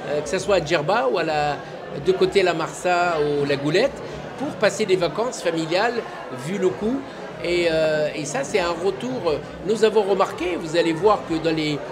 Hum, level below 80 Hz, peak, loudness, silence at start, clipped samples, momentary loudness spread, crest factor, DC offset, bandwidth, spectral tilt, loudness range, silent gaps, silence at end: none; -50 dBFS; -4 dBFS; -22 LUFS; 0 s; under 0.1%; 10 LU; 18 dB; under 0.1%; 15.5 kHz; -4.5 dB/octave; 2 LU; none; 0 s